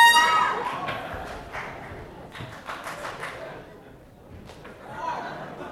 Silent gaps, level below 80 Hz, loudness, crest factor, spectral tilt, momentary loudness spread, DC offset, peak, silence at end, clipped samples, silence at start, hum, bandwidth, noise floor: none; -54 dBFS; -26 LUFS; 20 dB; -1.5 dB/octave; 22 LU; under 0.1%; -6 dBFS; 0 s; under 0.1%; 0 s; none; 16.5 kHz; -48 dBFS